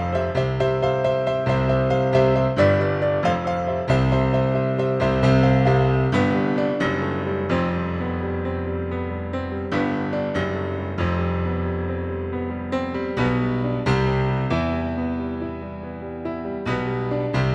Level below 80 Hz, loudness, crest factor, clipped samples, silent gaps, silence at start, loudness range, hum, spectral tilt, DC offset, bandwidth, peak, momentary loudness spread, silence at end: -38 dBFS; -22 LUFS; 16 dB; under 0.1%; none; 0 s; 6 LU; none; -8 dB/octave; under 0.1%; 8 kHz; -4 dBFS; 9 LU; 0 s